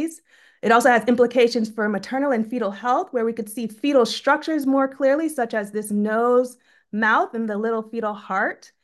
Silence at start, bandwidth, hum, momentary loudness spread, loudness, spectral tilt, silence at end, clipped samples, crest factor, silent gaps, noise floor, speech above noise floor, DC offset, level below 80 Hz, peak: 0 s; 12.5 kHz; none; 9 LU; -21 LUFS; -4.5 dB/octave; 0.3 s; under 0.1%; 18 dB; none; -50 dBFS; 29 dB; under 0.1%; -70 dBFS; -4 dBFS